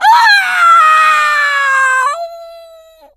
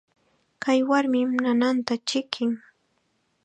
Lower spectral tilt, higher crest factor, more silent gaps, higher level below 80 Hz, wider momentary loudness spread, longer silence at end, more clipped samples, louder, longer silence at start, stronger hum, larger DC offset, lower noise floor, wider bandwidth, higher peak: second, 3 dB/octave vs -3.5 dB/octave; second, 10 dB vs 22 dB; neither; first, -64 dBFS vs -76 dBFS; first, 10 LU vs 7 LU; second, 0.55 s vs 0.85 s; neither; first, -8 LUFS vs -24 LUFS; second, 0 s vs 0.6 s; neither; neither; second, -40 dBFS vs -71 dBFS; first, 15.5 kHz vs 9.2 kHz; first, 0 dBFS vs -4 dBFS